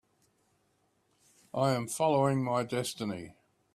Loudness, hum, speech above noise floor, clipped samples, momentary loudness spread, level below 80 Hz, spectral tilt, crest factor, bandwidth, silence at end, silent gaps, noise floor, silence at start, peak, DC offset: -31 LUFS; none; 43 dB; under 0.1%; 13 LU; -70 dBFS; -5.5 dB/octave; 20 dB; 15.5 kHz; 0.45 s; none; -73 dBFS; 1.55 s; -14 dBFS; under 0.1%